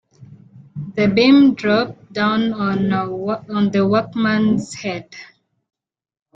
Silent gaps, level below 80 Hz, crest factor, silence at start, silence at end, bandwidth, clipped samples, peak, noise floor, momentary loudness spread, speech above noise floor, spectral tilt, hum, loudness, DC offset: none; -54 dBFS; 16 dB; 0.2 s; 1.1 s; 9 kHz; under 0.1%; -2 dBFS; -44 dBFS; 16 LU; 27 dB; -6.5 dB/octave; none; -17 LUFS; under 0.1%